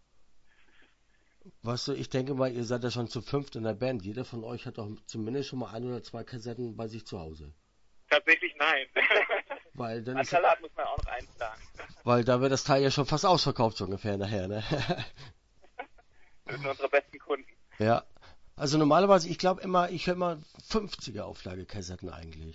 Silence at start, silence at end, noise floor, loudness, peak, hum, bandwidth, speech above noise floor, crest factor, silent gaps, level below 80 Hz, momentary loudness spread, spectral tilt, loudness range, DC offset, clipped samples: 0.35 s; 0 s; -66 dBFS; -29 LUFS; -8 dBFS; none; 8 kHz; 36 dB; 22 dB; none; -52 dBFS; 18 LU; -5 dB/octave; 8 LU; under 0.1%; under 0.1%